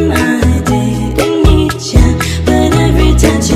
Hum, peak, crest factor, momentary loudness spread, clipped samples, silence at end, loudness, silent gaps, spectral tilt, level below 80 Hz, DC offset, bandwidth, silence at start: none; 0 dBFS; 10 dB; 4 LU; 1%; 0 s; -11 LUFS; none; -5.5 dB/octave; -14 dBFS; under 0.1%; 15.5 kHz; 0 s